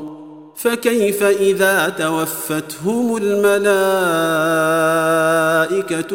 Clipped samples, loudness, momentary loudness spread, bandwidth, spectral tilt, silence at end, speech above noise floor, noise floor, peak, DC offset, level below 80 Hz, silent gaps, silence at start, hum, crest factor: under 0.1%; -16 LUFS; 7 LU; 16.5 kHz; -4 dB/octave; 0 s; 20 dB; -36 dBFS; -2 dBFS; 0.2%; -66 dBFS; none; 0 s; none; 14 dB